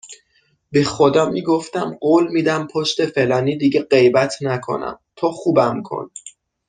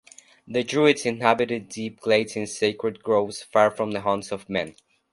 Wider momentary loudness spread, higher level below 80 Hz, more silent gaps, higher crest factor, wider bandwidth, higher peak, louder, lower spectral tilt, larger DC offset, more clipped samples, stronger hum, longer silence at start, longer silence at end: about the same, 11 LU vs 10 LU; about the same, -58 dBFS vs -62 dBFS; neither; second, 16 dB vs 22 dB; second, 9.6 kHz vs 11.5 kHz; about the same, -2 dBFS vs -2 dBFS; first, -18 LUFS vs -24 LUFS; about the same, -5.5 dB/octave vs -4.5 dB/octave; neither; neither; neither; second, 0.05 s vs 0.5 s; about the same, 0.4 s vs 0.4 s